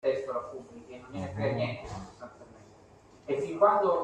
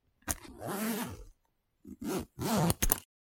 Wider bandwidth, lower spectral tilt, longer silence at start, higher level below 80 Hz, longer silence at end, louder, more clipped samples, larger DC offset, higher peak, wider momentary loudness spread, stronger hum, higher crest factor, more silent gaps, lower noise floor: second, 9.2 kHz vs 17 kHz; first, -7 dB/octave vs -4 dB/octave; second, 0.05 s vs 0.25 s; second, -62 dBFS vs -46 dBFS; second, 0 s vs 0.35 s; first, -30 LUFS vs -34 LUFS; neither; neither; second, -10 dBFS vs 0 dBFS; first, 23 LU vs 13 LU; neither; second, 22 dB vs 36 dB; neither; second, -56 dBFS vs -77 dBFS